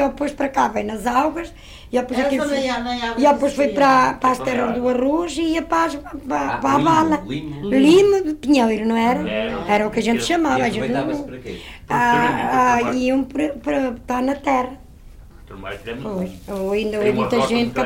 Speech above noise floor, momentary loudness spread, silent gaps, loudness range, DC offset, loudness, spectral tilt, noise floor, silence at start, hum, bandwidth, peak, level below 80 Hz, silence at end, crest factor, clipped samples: 22 dB; 12 LU; none; 6 LU; under 0.1%; -19 LUFS; -5 dB/octave; -41 dBFS; 0 s; none; 16.5 kHz; -6 dBFS; -44 dBFS; 0 s; 14 dB; under 0.1%